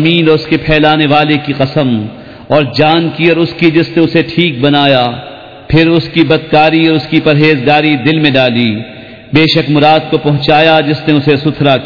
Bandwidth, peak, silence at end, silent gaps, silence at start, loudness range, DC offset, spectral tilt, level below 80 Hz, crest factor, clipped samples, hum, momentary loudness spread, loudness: 5.4 kHz; 0 dBFS; 0 s; none; 0 s; 1 LU; 0.6%; -8 dB/octave; -36 dBFS; 10 dB; 1%; none; 5 LU; -9 LUFS